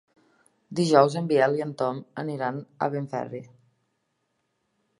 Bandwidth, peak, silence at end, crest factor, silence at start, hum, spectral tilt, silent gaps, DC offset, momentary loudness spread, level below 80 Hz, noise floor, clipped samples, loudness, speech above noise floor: 11.5 kHz; -2 dBFS; 1.55 s; 24 dB; 0.7 s; none; -6 dB/octave; none; under 0.1%; 14 LU; -76 dBFS; -76 dBFS; under 0.1%; -25 LUFS; 51 dB